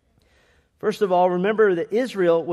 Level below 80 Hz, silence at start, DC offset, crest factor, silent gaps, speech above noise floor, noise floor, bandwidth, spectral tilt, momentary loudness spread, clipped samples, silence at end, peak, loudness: -68 dBFS; 0.85 s; under 0.1%; 14 dB; none; 40 dB; -60 dBFS; 13 kHz; -6.5 dB/octave; 7 LU; under 0.1%; 0 s; -6 dBFS; -21 LUFS